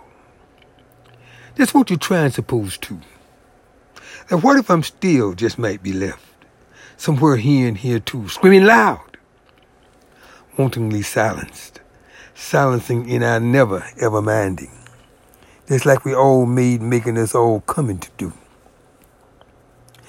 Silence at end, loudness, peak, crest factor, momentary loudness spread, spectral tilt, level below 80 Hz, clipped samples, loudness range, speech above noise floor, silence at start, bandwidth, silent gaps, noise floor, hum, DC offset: 1.75 s; -17 LUFS; 0 dBFS; 18 dB; 17 LU; -6 dB/octave; -52 dBFS; under 0.1%; 6 LU; 37 dB; 1.55 s; 16.5 kHz; none; -53 dBFS; none; under 0.1%